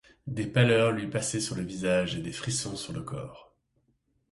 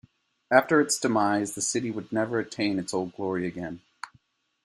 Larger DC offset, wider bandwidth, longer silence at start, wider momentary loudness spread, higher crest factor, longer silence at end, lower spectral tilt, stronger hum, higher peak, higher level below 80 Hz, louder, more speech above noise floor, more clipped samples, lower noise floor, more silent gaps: neither; second, 11.5 kHz vs 14 kHz; second, 0.25 s vs 0.5 s; about the same, 15 LU vs 17 LU; about the same, 22 dB vs 24 dB; first, 0.9 s vs 0.55 s; about the same, -4.5 dB/octave vs -4 dB/octave; neither; second, -8 dBFS vs -4 dBFS; first, -56 dBFS vs -68 dBFS; second, -29 LUFS vs -26 LUFS; first, 44 dB vs 38 dB; neither; first, -73 dBFS vs -64 dBFS; neither